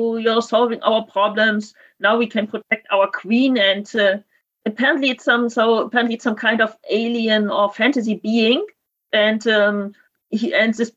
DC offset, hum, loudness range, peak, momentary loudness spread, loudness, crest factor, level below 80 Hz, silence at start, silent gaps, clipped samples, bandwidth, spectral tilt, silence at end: under 0.1%; none; 1 LU; -2 dBFS; 7 LU; -18 LUFS; 18 dB; -72 dBFS; 0 s; none; under 0.1%; 8 kHz; -4.5 dB/octave; 0.05 s